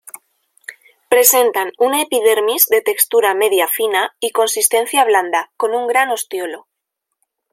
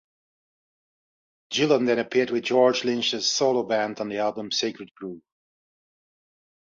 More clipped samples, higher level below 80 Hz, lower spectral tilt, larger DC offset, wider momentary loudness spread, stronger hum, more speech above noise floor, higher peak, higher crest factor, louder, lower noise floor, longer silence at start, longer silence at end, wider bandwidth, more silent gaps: neither; about the same, -72 dBFS vs -72 dBFS; second, 0.5 dB/octave vs -3.5 dB/octave; neither; about the same, 12 LU vs 12 LU; neither; second, 62 dB vs over 66 dB; first, 0 dBFS vs -6 dBFS; about the same, 16 dB vs 20 dB; first, -14 LUFS vs -23 LUFS; second, -77 dBFS vs under -90 dBFS; second, 0.7 s vs 1.5 s; second, 0.95 s vs 1.5 s; first, 16.5 kHz vs 7.6 kHz; second, none vs 4.91-4.95 s